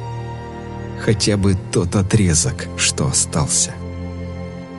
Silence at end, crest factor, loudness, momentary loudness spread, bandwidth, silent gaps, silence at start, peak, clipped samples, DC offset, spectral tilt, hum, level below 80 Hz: 0 s; 16 dB; -17 LUFS; 14 LU; 11.5 kHz; none; 0 s; -2 dBFS; under 0.1%; under 0.1%; -4 dB/octave; none; -38 dBFS